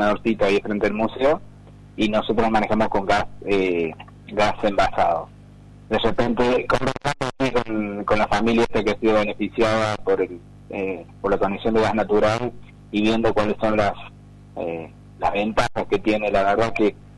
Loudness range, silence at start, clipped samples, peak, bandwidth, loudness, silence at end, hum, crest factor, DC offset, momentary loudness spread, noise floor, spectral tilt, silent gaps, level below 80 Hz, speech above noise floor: 2 LU; 0 s; under 0.1%; -10 dBFS; 11.5 kHz; -22 LUFS; 0.05 s; 50 Hz at -45 dBFS; 12 dB; under 0.1%; 10 LU; -44 dBFS; -6 dB/octave; none; -40 dBFS; 24 dB